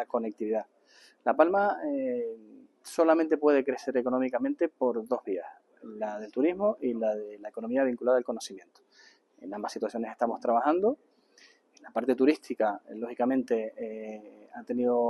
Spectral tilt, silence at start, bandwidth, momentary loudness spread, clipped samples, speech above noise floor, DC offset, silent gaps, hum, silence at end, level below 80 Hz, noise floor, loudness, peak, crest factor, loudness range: -5.5 dB/octave; 0 s; 12.5 kHz; 16 LU; under 0.1%; 32 dB; under 0.1%; none; none; 0 s; -80 dBFS; -61 dBFS; -29 LUFS; -8 dBFS; 22 dB; 4 LU